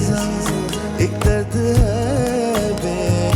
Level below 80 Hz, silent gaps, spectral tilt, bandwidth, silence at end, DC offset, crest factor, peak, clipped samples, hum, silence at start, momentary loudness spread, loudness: -28 dBFS; none; -6 dB/octave; 16.5 kHz; 0 s; under 0.1%; 12 dB; -6 dBFS; under 0.1%; none; 0 s; 4 LU; -19 LUFS